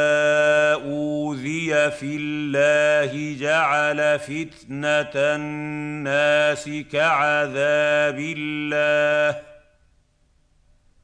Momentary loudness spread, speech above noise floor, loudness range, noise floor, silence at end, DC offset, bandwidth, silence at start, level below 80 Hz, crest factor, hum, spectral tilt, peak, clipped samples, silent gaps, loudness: 10 LU; 41 dB; 2 LU; -62 dBFS; 1.5 s; under 0.1%; 10 kHz; 0 s; -60 dBFS; 14 dB; none; -4.5 dB/octave; -8 dBFS; under 0.1%; none; -21 LUFS